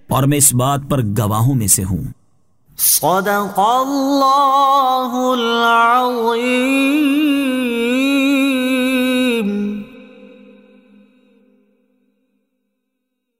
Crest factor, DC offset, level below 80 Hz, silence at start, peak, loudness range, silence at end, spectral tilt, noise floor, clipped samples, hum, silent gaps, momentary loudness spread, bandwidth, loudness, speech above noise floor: 16 dB; under 0.1%; -46 dBFS; 0.1 s; 0 dBFS; 7 LU; 3.15 s; -4 dB/octave; -74 dBFS; under 0.1%; none; none; 6 LU; 16.5 kHz; -14 LUFS; 59 dB